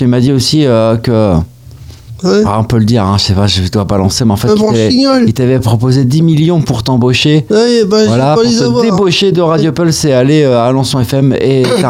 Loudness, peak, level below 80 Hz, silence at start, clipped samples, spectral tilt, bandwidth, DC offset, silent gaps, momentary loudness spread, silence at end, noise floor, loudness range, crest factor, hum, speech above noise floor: -9 LUFS; 0 dBFS; -34 dBFS; 0 s; under 0.1%; -6 dB/octave; 16 kHz; 0.1%; none; 3 LU; 0 s; -31 dBFS; 2 LU; 8 dB; none; 23 dB